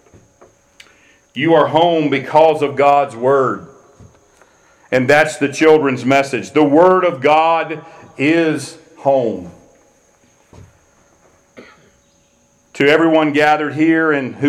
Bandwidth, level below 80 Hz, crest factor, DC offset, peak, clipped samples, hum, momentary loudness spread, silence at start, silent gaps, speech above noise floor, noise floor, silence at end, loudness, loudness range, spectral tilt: 13 kHz; -58 dBFS; 16 dB; under 0.1%; 0 dBFS; under 0.1%; none; 9 LU; 1.35 s; none; 42 dB; -55 dBFS; 0 s; -14 LUFS; 8 LU; -5.5 dB/octave